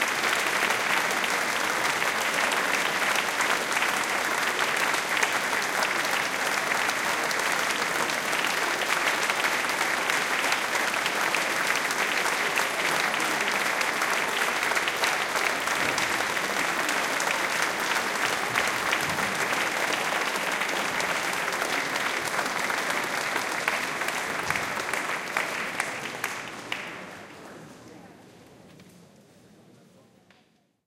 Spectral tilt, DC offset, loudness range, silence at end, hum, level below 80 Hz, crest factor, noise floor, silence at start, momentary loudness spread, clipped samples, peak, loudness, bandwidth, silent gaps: -1 dB/octave; under 0.1%; 5 LU; 1.8 s; none; -66 dBFS; 22 dB; -65 dBFS; 0 s; 4 LU; under 0.1%; -6 dBFS; -25 LUFS; 17 kHz; none